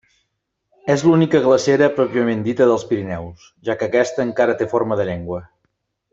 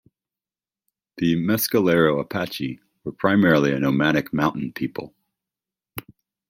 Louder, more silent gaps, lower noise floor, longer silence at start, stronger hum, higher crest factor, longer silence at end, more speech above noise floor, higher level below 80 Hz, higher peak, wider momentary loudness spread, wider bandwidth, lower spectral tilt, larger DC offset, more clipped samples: first, -18 LUFS vs -21 LUFS; neither; second, -74 dBFS vs under -90 dBFS; second, 0.85 s vs 1.15 s; neither; about the same, 16 dB vs 20 dB; first, 0.65 s vs 0.5 s; second, 57 dB vs over 69 dB; about the same, -56 dBFS vs -58 dBFS; about the same, -2 dBFS vs -4 dBFS; second, 15 LU vs 18 LU; second, 8 kHz vs 16.5 kHz; about the same, -6.5 dB/octave vs -6 dB/octave; neither; neither